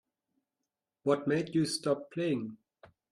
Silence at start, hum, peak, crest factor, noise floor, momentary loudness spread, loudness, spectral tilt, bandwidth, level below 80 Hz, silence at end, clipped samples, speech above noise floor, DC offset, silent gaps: 1.05 s; none; -16 dBFS; 20 dB; -88 dBFS; 7 LU; -32 LUFS; -5.5 dB/octave; 13 kHz; -74 dBFS; 0.55 s; under 0.1%; 57 dB; under 0.1%; none